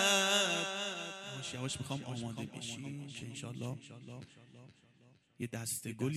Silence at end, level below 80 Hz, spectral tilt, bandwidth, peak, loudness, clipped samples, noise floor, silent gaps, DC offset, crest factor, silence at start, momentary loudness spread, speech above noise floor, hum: 0 s; -72 dBFS; -3 dB/octave; 15 kHz; -14 dBFS; -37 LUFS; under 0.1%; -66 dBFS; none; under 0.1%; 24 dB; 0 s; 21 LU; 24 dB; none